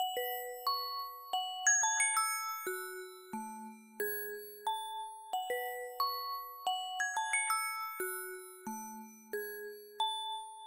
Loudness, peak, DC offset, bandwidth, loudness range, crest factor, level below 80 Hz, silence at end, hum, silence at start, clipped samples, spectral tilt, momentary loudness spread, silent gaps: -36 LUFS; -18 dBFS; under 0.1%; 16 kHz; 7 LU; 20 dB; -86 dBFS; 0 s; none; 0 s; under 0.1%; 1 dB/octave; 16 LU; none